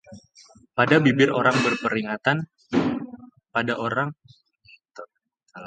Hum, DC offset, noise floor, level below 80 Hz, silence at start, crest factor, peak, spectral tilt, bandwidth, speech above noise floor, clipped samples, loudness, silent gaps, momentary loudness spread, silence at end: none; under 0.1%; -68 dBFS; -62 dBFS; 0.1 s; 22 dB; -2 dBFS; -6 dB/octave; 9.2 kHz; 46 dB; under 0.1%; -22 LUFS; none; 16 LU; 0 s